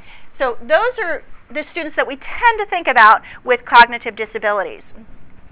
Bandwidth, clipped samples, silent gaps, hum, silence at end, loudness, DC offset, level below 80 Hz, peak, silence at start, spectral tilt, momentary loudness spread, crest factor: 4 kHz; 0.5%; none; none; 0.05 s; -15 LUFS; under 0.1%; -46 dBFS; 0 dBFS; 0.05 s; -6 dB/octave; 15 LU; 16 dB